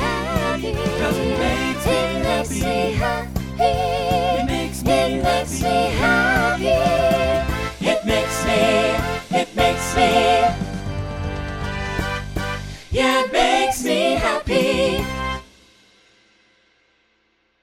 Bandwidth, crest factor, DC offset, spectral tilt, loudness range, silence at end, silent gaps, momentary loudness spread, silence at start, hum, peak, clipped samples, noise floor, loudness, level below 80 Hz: 17 kHz; 16 dB; under 0.1%; -4.5 dB/octave; 3 LU; 2.2 s; none; 10 LU; 0 s; none; -4 dBFS; under 0.1%; -64 dBFS; -20 LUFS; -34 dBFS